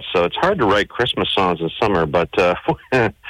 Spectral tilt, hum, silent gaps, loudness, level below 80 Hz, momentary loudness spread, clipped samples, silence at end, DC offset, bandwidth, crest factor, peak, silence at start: -6 dB/octave; none; none; -18 LUFS; -42 dBFS; 3 LU; under 0.1%; 0 s; under 0.1%; 12 kHz; 10 dB; -8 dBFS; 0 s